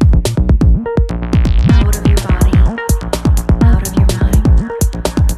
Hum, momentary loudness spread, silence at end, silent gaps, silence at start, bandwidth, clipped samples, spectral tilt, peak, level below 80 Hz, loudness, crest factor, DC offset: none; 5 LU; 0 s; none; 0 s; 14.5 kHz; under 0.1%; -6.5 dB/octave; 0 dBFS; -12 dBFS; -13 LUFS; 10 dB; under 0.1%